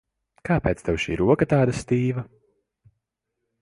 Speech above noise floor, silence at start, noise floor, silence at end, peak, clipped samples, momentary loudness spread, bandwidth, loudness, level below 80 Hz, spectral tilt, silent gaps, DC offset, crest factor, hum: 59 dB; 0.45 s; -81 dBFS; 1.4 s; -6 dBFS; under 0.1%; 13 LU; 11.5 kHz; -23 LUFS; -44 dBFS; -7 dB/octave; none; under 0.1%; 20 dB; none